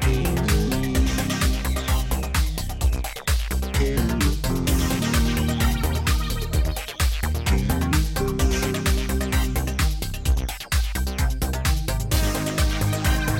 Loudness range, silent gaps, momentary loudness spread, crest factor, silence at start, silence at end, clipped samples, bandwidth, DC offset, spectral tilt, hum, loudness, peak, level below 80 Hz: 1 LU; none; 3 LU; 14 dB; 0 s; 0 s; under 0.1%; 17 kHz; under 0.1%; -5 dB/octave; none; -23 LUFS; -8 dBFS; -24 dBFS